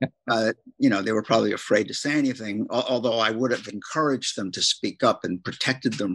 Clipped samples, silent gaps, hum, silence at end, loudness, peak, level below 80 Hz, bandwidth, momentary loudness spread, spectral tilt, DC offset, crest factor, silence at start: under 0.1%; none; none; 0 s; -24 LUFS; -6 dBFS; -70 dBFS; 12 kHz; 5 LU; -4 dB/octave; under 0.1%; 18 dB; 0 s